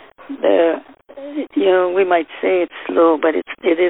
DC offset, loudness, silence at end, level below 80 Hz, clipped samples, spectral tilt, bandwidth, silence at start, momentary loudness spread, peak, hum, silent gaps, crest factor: 0.1%; -17 LUFS; 0 s; -64 dBFS; under 0.1%; -9 dB/octave; 4 kHz; 0.2 s; 13 LU; -2 dBFS; none; none; 14 dB